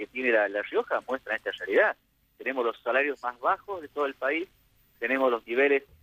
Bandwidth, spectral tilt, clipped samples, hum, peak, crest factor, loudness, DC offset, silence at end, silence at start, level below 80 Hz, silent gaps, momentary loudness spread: 15.5 kHz; -4.5 dB/octave; under 0.1%; none; -12 dBFS; 16 dB; -28 LUFS; under 0.1%; 0.2 s; 0 s; -68 dBFS; none; 9 LU